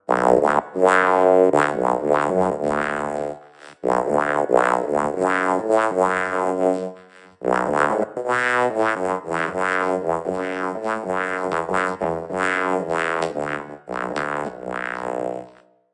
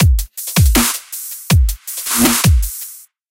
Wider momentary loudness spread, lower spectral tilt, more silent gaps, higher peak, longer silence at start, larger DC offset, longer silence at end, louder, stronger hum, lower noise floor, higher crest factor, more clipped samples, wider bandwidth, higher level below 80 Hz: second, 11 LU vs 14 LU; first, -5.5 dB/octave vs -4 dB/octave; neither; about the same, 0 dBFS vs 0 dBFS; about the same, 0.1 s vs 0 s; neither; first, 0.45 s vs 0.3 s; second, -21 LUFS vs -15 LUFS; neither; first, -49 dBFS vs -34 dBFS; first, 20 dB vs 14 dB; neither; second, 11.5 kHz vs 17.5 kHz; second, -58 dBFS vs -18 dBFS